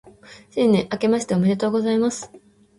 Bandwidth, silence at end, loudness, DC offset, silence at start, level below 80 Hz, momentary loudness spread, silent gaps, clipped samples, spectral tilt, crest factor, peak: 11.5 kHz; 0.4 s; -21 LUFS; under 0.1%; 0.05 s; -58 dBFS; 12 LU; none; under 0.1%; -6 dB/octave; 14 dB; -8 dBFS